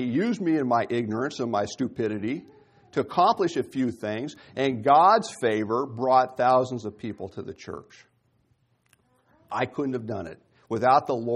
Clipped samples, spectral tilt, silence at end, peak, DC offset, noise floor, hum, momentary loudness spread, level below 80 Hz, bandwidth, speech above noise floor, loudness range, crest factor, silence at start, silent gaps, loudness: under 0.1%; -6 dB/octave; 0 s; -6 dBFS; under 0.1%; -68 dBFS; none; 15 LU; -66 dBFS; 11.5 kHz; 43 dB; 12 LU; 18 dB; 0 s; none; -25 LUFS